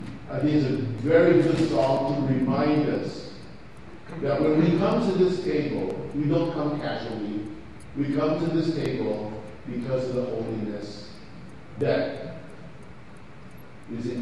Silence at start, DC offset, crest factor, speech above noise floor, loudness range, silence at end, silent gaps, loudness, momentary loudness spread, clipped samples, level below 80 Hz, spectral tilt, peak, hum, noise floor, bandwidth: 0 s; 0.6%; 18 dB; 22 dB; 8 LU; 0 s; none; -25 LUFS; 23 LU; under 0.1%; -52 dBFS; -8 dB/octave; -8 dBFS; none; -46 dBFS; 12 kHz